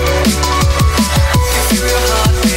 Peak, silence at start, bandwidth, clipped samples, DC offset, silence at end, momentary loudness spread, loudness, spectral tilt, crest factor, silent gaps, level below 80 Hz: 0 dBFS; 0 s; 16.5 kHz; under 0.1%; under 0.1%; 0 s; 1 LU; -12 LUFS; -4 dB/octave; 10 dB; none; -16 dBFS